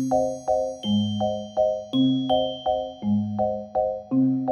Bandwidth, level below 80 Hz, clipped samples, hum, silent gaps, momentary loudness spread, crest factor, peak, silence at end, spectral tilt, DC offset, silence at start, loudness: 11 kHz; -54 dBFS; under 0.1%; none; none; 4 LU; 14 dB; -10 dBFS; 0 s; -7 dB/octave; under 0.1%; 0 s; -24 LUFS